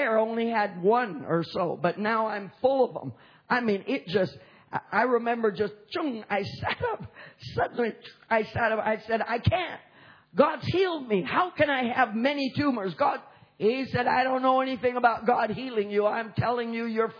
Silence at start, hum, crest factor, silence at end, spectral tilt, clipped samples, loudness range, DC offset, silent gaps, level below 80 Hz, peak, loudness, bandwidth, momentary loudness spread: 0 s; none; 20 dB; 0 s; -7.5 dB/octave; under 0.1%; 3 LU; under 0.1%; none; -58 dBFS; -8 dBFS; -27 LUFS; 5.4 kHz; 8 LU